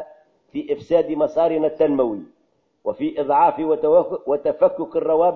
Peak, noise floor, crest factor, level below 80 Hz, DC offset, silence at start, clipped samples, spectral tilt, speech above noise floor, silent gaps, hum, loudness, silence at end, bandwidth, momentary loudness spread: -4 dBFS; -65 dBFS; 16 dB; -60 dBFS; under 0.1%; 0 s; under 0.1%; -8.5 dB/octave; 46 dB; none; none; -20 LUFS; 0 s; 6 kHz; 13 LU